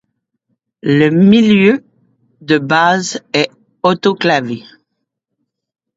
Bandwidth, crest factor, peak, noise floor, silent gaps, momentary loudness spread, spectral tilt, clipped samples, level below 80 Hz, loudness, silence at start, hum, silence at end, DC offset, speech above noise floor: 7.8 kHz; 14 dB; 0 dBFS; -73 dBFS; none; 12 LU; -5.5 dB/octave; under 0.1%; -56 dBFS; -13 LUFS; 0.85 s; none; 1.4 s; under 0.1%; 62 dB